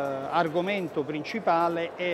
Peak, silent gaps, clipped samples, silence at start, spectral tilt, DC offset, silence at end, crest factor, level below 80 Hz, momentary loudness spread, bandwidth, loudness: -10 dBFS; none; under 0.1%; 0 s; -6 dB/octave; under 0.1%; 0 s; 16 dB; -70 dBFS; 6 LU; 15 kHz; -27 LUFS